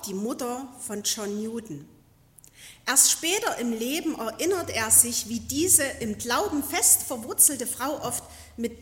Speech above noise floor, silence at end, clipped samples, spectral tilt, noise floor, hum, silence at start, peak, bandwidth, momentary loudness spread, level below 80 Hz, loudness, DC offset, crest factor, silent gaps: 30 dB; 0 s; under 0.1%; -1.5 dB/octave; -56 dBFS; none; 0 s; -2 dBFS; 16.5 kHz; 16 LU; -58 dBFS; -23 LUFS; under 0.1%; 24 dB; none